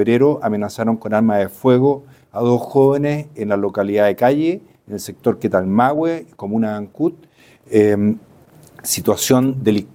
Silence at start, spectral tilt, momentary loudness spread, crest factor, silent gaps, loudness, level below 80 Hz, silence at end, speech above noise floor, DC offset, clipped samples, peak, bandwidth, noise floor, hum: 0 s; -6 dB/octave; 9 LU; 16 dB; none; -17 LUFS; -58 dBFS; 0.1 s; 30 dB; under 0.1%; under 0.1%; -2 dBFS; 17 kHz; -46 dBFS; none